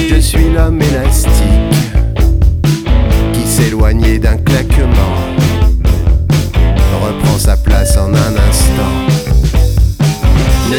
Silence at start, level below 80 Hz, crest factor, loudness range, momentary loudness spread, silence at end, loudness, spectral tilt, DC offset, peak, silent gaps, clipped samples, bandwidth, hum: 0 s; -12 dBFS; 8 dB; 0 LU; 2 LU; 0 s; -11 LUFS; -5.5 dB/octave; under 0.1%; 0 dBFS; none; under 0.1%; 17 kHz; none